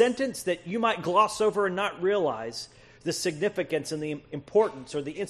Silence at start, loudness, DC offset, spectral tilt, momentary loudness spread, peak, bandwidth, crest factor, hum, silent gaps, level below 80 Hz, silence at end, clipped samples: 0 s; -28 LUFS; under 0.1%; -4.5 dB/octave; 11 LU; -8 dBFS; 13 kHz; 20 dB; none; none; -64 dBFS; 0 s; under 0.1%